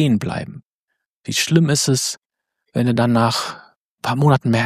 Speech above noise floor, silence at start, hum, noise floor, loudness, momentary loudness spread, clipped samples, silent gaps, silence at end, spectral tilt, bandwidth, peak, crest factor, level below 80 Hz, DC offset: 60 dB; 0 s; none; -77 dBFS; -18 LUFS; 16 LU; under 0.1%; 0.65-0.88 s, 1.08-1.24 s, 2.18-2.30 s, 3.76-3.98 s; 0 s; -5 dB/octave; 15.5 kHz; -2 dBFS; 18 dB; -56 dBFS; under 0.1%